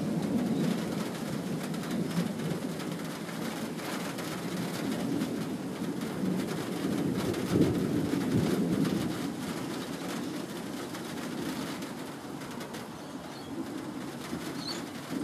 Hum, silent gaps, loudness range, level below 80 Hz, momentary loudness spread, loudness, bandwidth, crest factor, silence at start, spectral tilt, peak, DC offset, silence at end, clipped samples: none; none; 8 LU; -62 dBFS; 10 LU; -33 LUFS; 15.5 kHz; 20 dB; 0 s; -5.5 dB/octave; -12 dBFS; under 0.1%; 0 s; under 0.1%